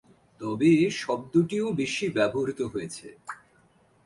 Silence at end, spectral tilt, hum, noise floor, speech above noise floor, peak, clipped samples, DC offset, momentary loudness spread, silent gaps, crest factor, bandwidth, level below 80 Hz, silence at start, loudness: 0.7 s; -6 dB/octave; none; -62 dBFS; 36 dB; -10 dBFS; under 0.1%; under 0.1%; 20 LU; none; 18 dB; 11.5 kHz; -62 dBFS; 0.4 s; -26 LUFS